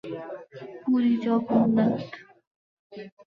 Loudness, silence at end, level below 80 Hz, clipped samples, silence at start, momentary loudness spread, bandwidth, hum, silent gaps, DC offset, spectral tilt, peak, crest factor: -24 LUFS; 0.2 s; -68 dBFS; under 0.1%; 0.05 s; 21 LU; 5.4 kHz; none; 2.47-2.90 s; under 0.1%; -9 dB/octave; -10 dBFS; 18 dB